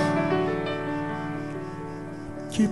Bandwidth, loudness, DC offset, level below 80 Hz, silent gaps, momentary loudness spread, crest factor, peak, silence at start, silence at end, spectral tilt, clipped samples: 11.5 kHz; -29 LUFS; 0.4%; -54 dBFS; none; 12 LU; 16 dB; -12 dBFS; 0 s; 0 s; -6.5 dB/octave; under 0.1%